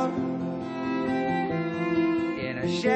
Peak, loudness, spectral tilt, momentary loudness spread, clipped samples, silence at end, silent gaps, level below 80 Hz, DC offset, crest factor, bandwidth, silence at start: -12 dBFS; -28 LUFS; -6.5 dB/octave; 6 LU; under 0.1%; 0 s; none; -60 dBFS; under 0.1%; 16 dB; 8.6 kHz; 0 s